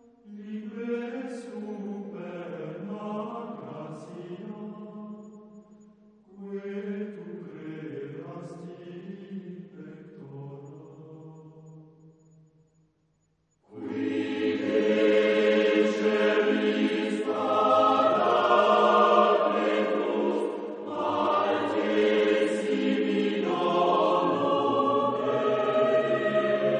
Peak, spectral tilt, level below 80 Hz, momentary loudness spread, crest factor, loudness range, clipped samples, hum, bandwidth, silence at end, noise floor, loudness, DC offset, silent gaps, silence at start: -8 dBFS; -6 dB/octave; -80 dBFS; 21 LU; 20 dB; 19 LU; under 0.1%; none; 9.8 kHz; 0 s; -71 dBFS; -25 LUFS; under 0.1%; none; 0.25 s